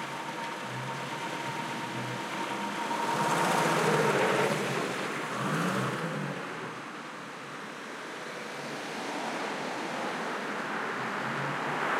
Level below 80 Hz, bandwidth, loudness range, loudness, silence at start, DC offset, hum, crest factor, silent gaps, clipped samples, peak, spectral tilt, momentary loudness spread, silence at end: -78 dBFS; 16.5 kHz; 9 LU; -32 LUFS; 0 s; under 0.1%; none; 18 dB; none; under 0.1%; -14 dBFS; -4 dB/octave; 13 LU; 0 s